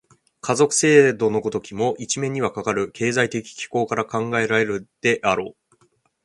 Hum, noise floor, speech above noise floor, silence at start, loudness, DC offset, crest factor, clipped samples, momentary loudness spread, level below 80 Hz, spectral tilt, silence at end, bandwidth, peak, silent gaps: none; -63 dBFS; 42 dB; 0.45 s; -21 LUFS; under 0.1%; 20 dB; under 0.1%; 11 LU; -58 dBFS; -4 dB/octave; 0.75 s; 11.5 kHz; -2 dBFS; none